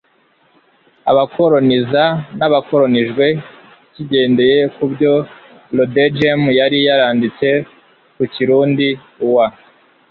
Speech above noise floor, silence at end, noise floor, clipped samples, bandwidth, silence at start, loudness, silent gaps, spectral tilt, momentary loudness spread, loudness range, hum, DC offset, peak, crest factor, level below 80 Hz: 42 dB; 0.6 s; -56 dBFS; under 0.1%; 4.8 kHz; 1.05 s; -14 LUFS; none; -8.5 dB/octave; 8 LU; 2 LU; none; under 0.1%; -2 dBFS; 14 dB; -56 dBFS